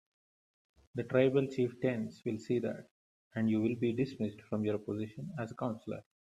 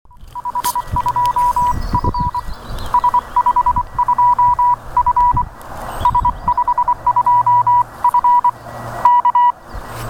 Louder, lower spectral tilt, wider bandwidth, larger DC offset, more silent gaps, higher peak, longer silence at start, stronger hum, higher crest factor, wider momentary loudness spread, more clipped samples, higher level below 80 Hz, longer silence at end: second, -35 LUFS vs -15 LUFS; first, -8 dB/octave vs -5 dB/octave; second, 10.5 kHz vs 17.5 kHz; neither; first, 2.91-3.31 s vs none; second, -14 dBFS vs 0 dBFS; first, 0.95 s vs 0.2 s; neither; first, 20 dB vs 14 dB; second, 12 LU vs 15 LU; neither; second, -72 dBFS vs -30 dBFS; first, 0.25 s vs 0 s